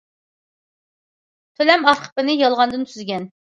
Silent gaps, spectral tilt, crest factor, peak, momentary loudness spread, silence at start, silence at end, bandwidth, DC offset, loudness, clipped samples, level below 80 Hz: 2.12-2.16 s; -4 dB/octave; 20 dB; 0 dBFS; 13 LU; 1.6 s; 0.3 s; 11 kHz; under 0.1%; -18 LUFS; under 0.1%; -68 dBFS